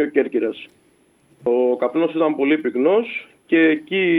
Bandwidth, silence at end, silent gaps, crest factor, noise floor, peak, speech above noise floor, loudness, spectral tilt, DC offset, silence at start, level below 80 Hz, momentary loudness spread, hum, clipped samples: 4.1 kHz; 0 s; none; 16 dB; -57 dBFS; -4 dBFS; 38 dB; -19 LUFS; -7.5 dB/octave; under 0.1%; 0 s; -72 dBFS; 10 LU; none; under 0.1%